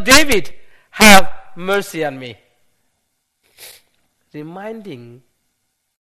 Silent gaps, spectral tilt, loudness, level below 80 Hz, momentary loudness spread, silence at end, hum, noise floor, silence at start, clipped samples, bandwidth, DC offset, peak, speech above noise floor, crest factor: none; -2.5 dB/octave; -12 LUFS; -38 dBFS; 27 LU; 0.05 s; none; -70 dBFS; 0 s; 0.3%; over 20 kHz; under 0.1%; 0 dBFS; 57 dB; 16 dB